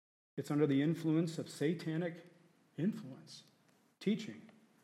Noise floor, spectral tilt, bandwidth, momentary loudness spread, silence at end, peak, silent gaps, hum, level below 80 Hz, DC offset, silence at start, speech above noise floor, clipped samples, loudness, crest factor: -67 dBFS; -7 dB/octave; 14 kHz; 21 LU; 0.4 s; -20 dBFS; none; none; -88 dBFS; under 0.1%; 0.35 s; 31 dB; under 0.1%; -37 LUFS; 20 dB